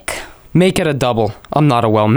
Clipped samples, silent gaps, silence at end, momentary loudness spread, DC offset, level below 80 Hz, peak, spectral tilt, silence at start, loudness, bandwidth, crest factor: under 0.1%; none; 0 s; 8 LU; under 0.1%; -40 dBFS; 0 dBFS; -6.5 dB/octave; 0.1 s; -15 LUFS; over 20 kHz; 14 dB